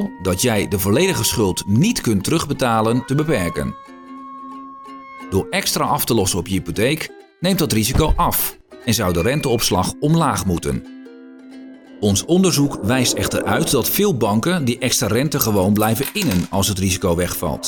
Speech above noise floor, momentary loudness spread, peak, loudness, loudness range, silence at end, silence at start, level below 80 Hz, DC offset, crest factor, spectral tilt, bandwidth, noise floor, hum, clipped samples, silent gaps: 21 dB; 15 LU; 0 dBFS; -18 LUFS; 4 LU; 0 s; 0 s; -36 dBFS; under 0.1%; 18 dB; -4.5 dB/octave; 19.5 kHz; -39 dBFS; none; under 0.1%; none